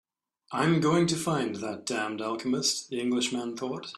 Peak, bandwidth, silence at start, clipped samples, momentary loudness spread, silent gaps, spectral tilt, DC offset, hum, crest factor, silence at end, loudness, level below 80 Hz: -12 dBFS; 13.5 kHz; 0.5 s; under 0.1%; 9 LU; none; -4.5 dB/octave; under 0.1%; none; 18 dB; 0 s; -28 LUFS; -68 dBFS